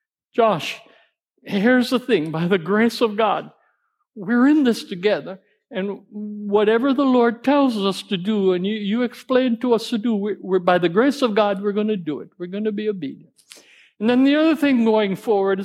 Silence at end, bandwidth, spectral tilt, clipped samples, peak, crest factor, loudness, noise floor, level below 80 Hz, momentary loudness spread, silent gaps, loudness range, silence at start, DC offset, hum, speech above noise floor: 0 s; 14.5 kHz; -6 dB/octave; under 0.1%; -2 dBFS; 18 dB; -20 LUFS; -68 dBFS; -76 dBFS; 12 LU; none; 2 LU; 0.35 s; under 0.1%; none; 49 dB